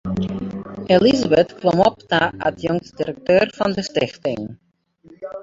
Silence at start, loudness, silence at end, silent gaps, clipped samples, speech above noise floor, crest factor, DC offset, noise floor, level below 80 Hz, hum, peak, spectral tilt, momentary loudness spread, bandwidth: 0.05 s; -19 LUFS; 0 s; none; under 0.1%; 32 dB; 18 dB; under 0.1%; -50 dBFS; -48 dBFS; none; -2 dBFS; -6 dB/octave; 15 LU; 7.8 kHz